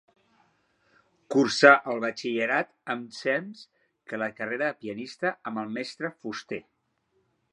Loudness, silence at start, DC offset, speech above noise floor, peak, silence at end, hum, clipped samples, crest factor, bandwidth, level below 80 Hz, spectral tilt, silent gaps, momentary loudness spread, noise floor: -26 LUFS; 1.3 s; under 0.1%; 46 dB; -2 dBFS; 0.9 s; none; under 0.1%; 26 dB; 10.5 kHz; -78 dBFS; -4 dB/octave; none; 19 LU; -73 dBFS